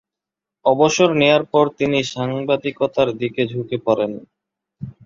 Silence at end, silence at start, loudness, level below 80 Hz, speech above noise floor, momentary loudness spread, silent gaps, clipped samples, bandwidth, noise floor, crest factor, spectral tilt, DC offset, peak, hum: 0.15 s; 0.65 s; -18 LUFS; -58 dBFS; 68 dB; 9 LU; none; under 0.1%; 7.6 kHz; -86 dBFS; 18 dB; -5 dB/octave; under 0.1%; -2 dBFS; none